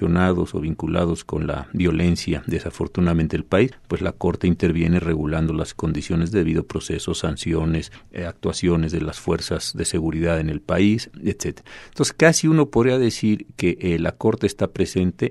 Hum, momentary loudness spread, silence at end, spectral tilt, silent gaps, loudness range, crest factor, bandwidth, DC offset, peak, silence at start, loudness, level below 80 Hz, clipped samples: none; 8 LU; 0 s; -6 dB/octave; none; 4 LU; 20 dB; 12.5 kHz; under 0.1%; 0 dBFS; 0 s; -22 LUFS; -38 dBFS; under 0.1%